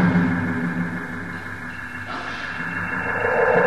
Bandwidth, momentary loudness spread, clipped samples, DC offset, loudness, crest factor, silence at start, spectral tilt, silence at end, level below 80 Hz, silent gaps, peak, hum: 12 kHz; 12 LU; under 0.1%; 0.7%; -24 LUFS; 16 dB; 0 s; -7.5 dB/octave; 0 s; -50 dBFS; none; -6 dBFS; none